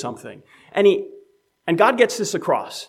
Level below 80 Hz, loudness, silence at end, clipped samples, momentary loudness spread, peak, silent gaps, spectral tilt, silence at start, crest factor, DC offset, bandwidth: -76 dBFS; -19 LUFS; 0.05 s; under 0.1%; 21 LU; -2 dBFS; none; -4 dB/octave; 0 s; 18 dB; under 0.1%; 15 kHz